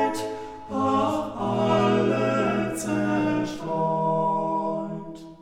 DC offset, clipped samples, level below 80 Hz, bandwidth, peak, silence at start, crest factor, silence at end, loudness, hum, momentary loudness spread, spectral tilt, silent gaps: under 0.1%; under 0.1%; -56 dBFS; 16 kHz; -10 dBFS; 0 s; 16 dB; 0 s; -25 LUFS; none; 11 LU; -6 dB/octave; none